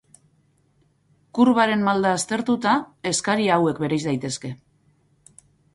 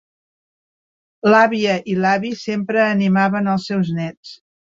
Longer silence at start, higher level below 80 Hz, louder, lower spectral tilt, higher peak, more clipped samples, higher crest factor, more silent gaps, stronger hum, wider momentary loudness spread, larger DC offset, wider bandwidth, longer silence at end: about the same, 1.35 s vs 1.25 s; about the same, -62 dBFS vs -62 dBFS; second, -21 LUFS vs -17 LUFS; second, -4.5 dB/octave vs -6.5 dB/octave; about the same, -4 dBFS vs -2 dBFS; neither; about the same, 18 dB vs 18 dB; second, none vs 4.17-4.23 s; neither; about the same, 12 LU vs 10 LU; neither; first, 11.5 kHz vs 7.6 kHz; first, 1.2 s vs 0.4 s